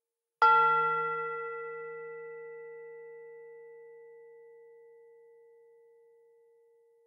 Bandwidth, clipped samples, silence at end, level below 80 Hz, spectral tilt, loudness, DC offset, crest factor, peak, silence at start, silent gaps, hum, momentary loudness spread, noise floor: 7 kHz; under 0.1%; 2.65 s; under -90 dBFS; -4.5 dB/octave; -28 LUFS; under 0.1%; 24 dB; -12 dBFS; 0.4 s; none; none; 28 LU; -65 dBFS